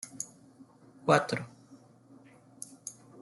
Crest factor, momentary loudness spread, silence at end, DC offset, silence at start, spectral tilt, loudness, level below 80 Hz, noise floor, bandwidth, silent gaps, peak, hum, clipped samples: 26 dB; 20 LU; 0 s; under 0.1%; 0.05 s; -4.5 dB/octave; -31 LUFS; -74 dBFS; -57 dBFS; 12 kHz; none; -10 dBFS; none; under 0.1%